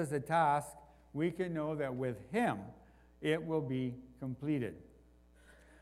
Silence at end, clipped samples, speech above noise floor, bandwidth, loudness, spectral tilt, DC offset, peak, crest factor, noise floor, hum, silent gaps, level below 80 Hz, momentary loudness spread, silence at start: 0.3 s; under 0.1%; 27 dB; 15 kHz; -36 LUFS; -6.5 dB/octave; under 0.1%; -18 dBFS; 18 dB; -63 dBFS; none; none; -66 dBFS; 14 LU; 0 s